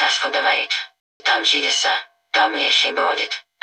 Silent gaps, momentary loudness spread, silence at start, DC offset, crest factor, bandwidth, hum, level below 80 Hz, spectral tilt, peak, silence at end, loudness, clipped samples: 1.00-1.20 s; 9 LU; 0 s; under 0.1%; 16 dB; 10.5 kHz; none; -78 dBFS; 2 dB/octave; -4 dBFS; 0.25 s; -18 LUFS; under 0.1%